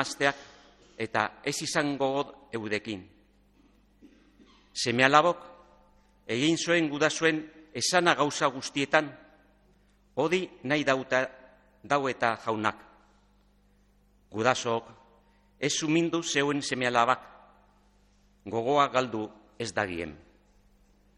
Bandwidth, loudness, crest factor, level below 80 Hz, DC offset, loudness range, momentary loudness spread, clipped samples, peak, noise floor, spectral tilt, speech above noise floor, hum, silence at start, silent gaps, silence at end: 13.5 kHz; -28 LUFS; 26 dB; -66 dBFS; under 0.1%; 6 LU; 14 LU; under 0.1%; -4 dBFS; -64 dBFS; -3.5 dB/octave; 36 dB; 50 Hz at -65 dBFS; 0 s; none; 1 s